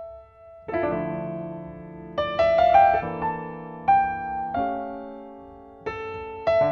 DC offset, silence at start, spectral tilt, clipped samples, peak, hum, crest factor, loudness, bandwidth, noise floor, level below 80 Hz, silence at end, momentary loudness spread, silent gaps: under 0.1%; 0 s; -7.5 dB/octave; under 0.1%; -6 dBFS; none; 18 dB; -24 LUFS; 6.6 kHz; -47 dBFS; -50 dBFS; 0 s; 22 LU; none